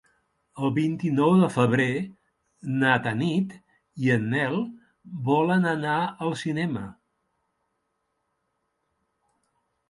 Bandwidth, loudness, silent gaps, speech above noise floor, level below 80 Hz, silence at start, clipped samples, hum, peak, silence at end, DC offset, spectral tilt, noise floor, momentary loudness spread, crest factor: 11.5 kHz; -25 LUFS; none; 53 dB; -66 dBFS; 0.55 s; under 0.1%; none; -6 dBFS; 2.95 s; under 0.1%; -7 dB/octave; -77 dBFS; 13 LU; 20 dB